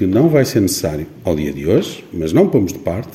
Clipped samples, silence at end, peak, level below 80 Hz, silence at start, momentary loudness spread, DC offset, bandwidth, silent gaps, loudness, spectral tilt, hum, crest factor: under 0.1%; 0 s; 0 dBFS; -40 dBFS; 0 s; 10 LU; under 0.1%; 16.5 kHz; none; -16 LUFS; -6 dB/octave; none; 16 dB